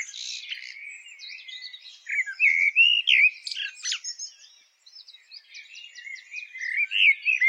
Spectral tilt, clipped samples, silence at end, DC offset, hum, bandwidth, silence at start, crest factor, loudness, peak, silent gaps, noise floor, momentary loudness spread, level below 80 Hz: 7 dB/octave; under 0.1%; 0 s; under 0.1%; none; 11 kHz; 0 s; 18 dB; -21 LUFS; -8 dBFS; none; -56 dBFS; 23 LU; -78 dBFS